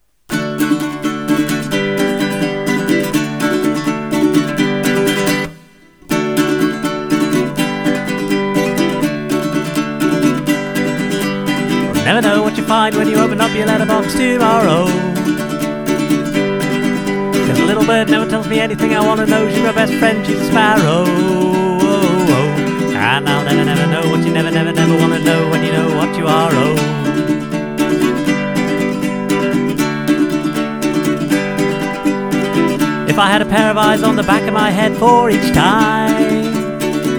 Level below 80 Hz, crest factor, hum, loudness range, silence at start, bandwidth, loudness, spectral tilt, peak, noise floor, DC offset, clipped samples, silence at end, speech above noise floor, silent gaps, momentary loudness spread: -44 dBFS; 14 dB; none; 4 LU; 0.3 s; over 20 kHz; -14 LUFS; -5.5 dB/octave; 0 dBFS; -43 dBFS; 0.1%; under 0.1%; 0 s; 31 dB; none; 6 LU